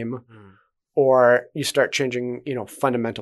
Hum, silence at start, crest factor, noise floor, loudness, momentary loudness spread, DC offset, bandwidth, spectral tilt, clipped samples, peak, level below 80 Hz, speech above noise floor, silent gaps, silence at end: none; 0 s; 18 dB; -55 dBFS; -21 LUFS; 14 LU; under 0.1%; 12.5 kHz; -4.5 dB/octave; under 0.1%; -4 dBFS; -68 dBFS; 34 dB; none; 0 s